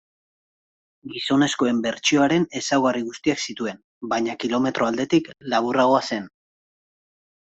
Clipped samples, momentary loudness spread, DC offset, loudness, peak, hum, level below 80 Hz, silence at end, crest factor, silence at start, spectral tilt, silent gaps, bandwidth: under 0.1%; 11 LU; under 0.1%; -22 LUFS; -6 dBFS; none; -64 dBFS; 1.3 s; 18 dB; 1.05 s; -4 dB/octave; 3.84-4.01 s; 8.2 kHz